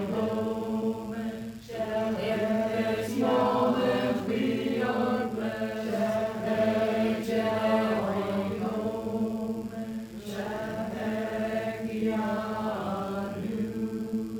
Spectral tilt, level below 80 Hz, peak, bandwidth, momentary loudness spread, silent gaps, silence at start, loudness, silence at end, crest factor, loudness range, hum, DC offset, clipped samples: -6.5 dB/octave; -58 dBFS; -14 dBFS; 17.5 kHz; 8 LU; none; 0 s; -29 LUFS; 0 s; 16 dB; 5 LU; none; under 0.1%; under 0.1%